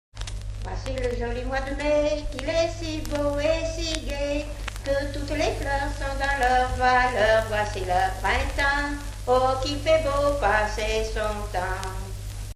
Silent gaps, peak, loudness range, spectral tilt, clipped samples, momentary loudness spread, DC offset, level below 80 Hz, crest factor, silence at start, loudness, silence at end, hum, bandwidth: none; -4 dBFS; 4 LU; -4.5 dB/octave; under 0.1%; 11 LU; under 0.1%; -32 dBFS; 22 dB; 0.15 s; -25 LUFS; 0 s; 50 Hz at -35 dBFS; 14.5 kHz